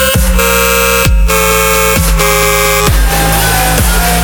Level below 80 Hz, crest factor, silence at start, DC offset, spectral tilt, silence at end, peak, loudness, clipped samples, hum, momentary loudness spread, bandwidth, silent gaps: -14 dBFS; 8 dB; 0 s; under 0.1%; -3 dB/octave; 0 s; 0 dBFS; -8 LUFS; 0.2%; none; 2 LU; over 20 kHz; none